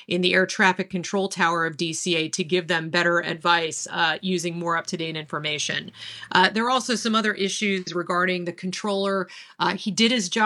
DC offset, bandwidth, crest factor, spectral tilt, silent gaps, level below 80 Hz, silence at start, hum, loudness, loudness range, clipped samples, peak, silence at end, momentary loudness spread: under 0.1%; 12.5 kHz; 22 dB; -3.5 dB/octave; none; -72 dBFS; 0 s; none; -23 LUFS; 2 LU; under 0.1%; -2 dBFS; 0 s; 8 LU